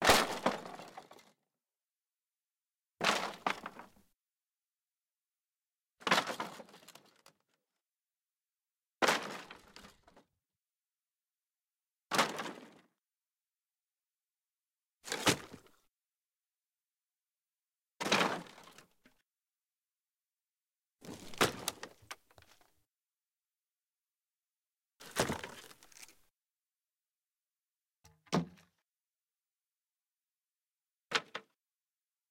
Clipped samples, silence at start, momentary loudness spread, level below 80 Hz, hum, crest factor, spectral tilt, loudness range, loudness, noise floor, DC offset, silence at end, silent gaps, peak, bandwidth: under 0.1%; 0 s; 23 LU; -68 dBFS; none; 28 dB; -2.5 dB/octave; 6 LU; -35 LUFS; under -90 dBFS; under 0.1%; 0.9 s; 23.55-23.59 s; -14 dBFS; 16.5 kHz